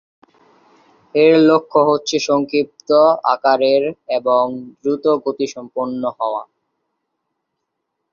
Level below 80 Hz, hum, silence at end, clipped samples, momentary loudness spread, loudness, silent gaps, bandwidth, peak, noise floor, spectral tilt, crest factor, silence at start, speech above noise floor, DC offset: -64 dBFS; none; 1.7 s; under 0.1%; 11 LU; -16 LUFS; none; 7.4 kHz; -2 dBFS; -76 dBFS; -5 dB/octave; 16 dB; 1.15 s; 60 dB; under 0.1%